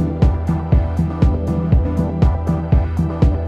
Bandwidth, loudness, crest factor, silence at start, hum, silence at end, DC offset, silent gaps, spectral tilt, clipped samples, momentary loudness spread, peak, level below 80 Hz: 6.8 kHz; -18 LUFS; 14 dB; 0 s; none; 0 s; under 0.1%; none; -10 dB/octave; under 0.1%; 3 LU; -2 dBFS; -20 dBFS